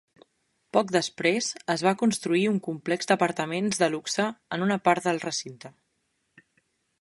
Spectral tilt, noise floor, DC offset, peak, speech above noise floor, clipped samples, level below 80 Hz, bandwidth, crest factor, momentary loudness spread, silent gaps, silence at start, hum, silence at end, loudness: -4 dB/octave; -75 dBFS; under 0.1%; -6 dBFS; 49 dB; under 0.1%; -72 dBFS; 11.5 kHz; 22 dB; 6 LU; none; 0.75 s; none; 1.3 s; -26 LUFS